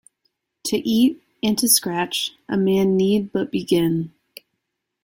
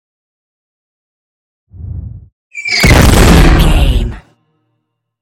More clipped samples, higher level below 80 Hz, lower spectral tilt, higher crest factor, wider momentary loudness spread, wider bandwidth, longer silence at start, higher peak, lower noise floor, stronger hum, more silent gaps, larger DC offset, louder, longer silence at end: second, under 0.1% vs 0.4%; second, -58 dBFS vs -14 dBFS; about the same, -4 dB/octave vs -5 dB/octave; first, 20 dB vs 12 dB; second, 9 LU vs 22 LU; about the same, 16.5 kHz vs 17.5 kHz; second, 0.65 s vs 1.8 s; about the same, -2 dBFS vs 0 dBFS; first, -78 dBFS vs -68 dBFS; neither; second, none vs 2.33-2.50 s; neither; second, -20 LUFS vs -8 LUFS; about the same, 0.95 s vs 1.05 s